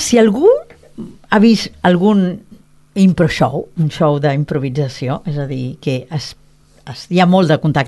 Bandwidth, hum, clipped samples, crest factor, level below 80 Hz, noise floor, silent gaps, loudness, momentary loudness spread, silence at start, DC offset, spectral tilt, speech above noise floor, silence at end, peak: 12.5 kHz; none; under 0.1%; 14 dB; -46 dBFS; -36 dBFS; none; -15 LUFS; 16 LU; 0 s; under 0.1%; -6.5 dB/octave; 23 dB; 0 s; 0 dBFS